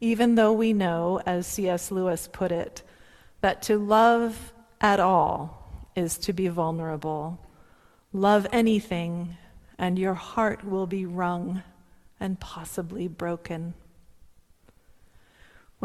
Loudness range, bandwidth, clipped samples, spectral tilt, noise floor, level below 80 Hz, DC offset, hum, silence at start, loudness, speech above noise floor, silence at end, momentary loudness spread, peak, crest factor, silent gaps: 11 LU; 15 kHz; under 0.1%; -5.5 dB/octave; -58 dBFS; -52 dBFS; under 0.1%; none; 0 s; -26 LUFS; 33 dB; 0 s; 15 LU; -8 dBFS; 20 dB; none